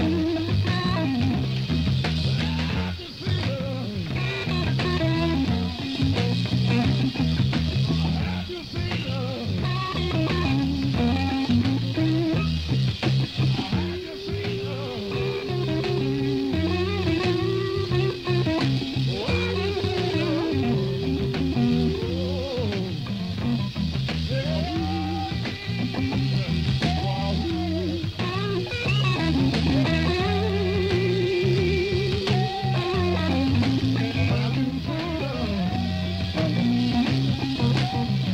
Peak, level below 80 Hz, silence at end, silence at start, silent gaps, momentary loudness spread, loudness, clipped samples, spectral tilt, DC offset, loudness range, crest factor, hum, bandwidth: -10 dBFS; -38 dBFS; 0 s; 0 s; none; 6 LU; -25 LUFS; under 0.1%; -7 dB/octave; under 0.1%; 3 LU; 14 dB; none; 10 kHz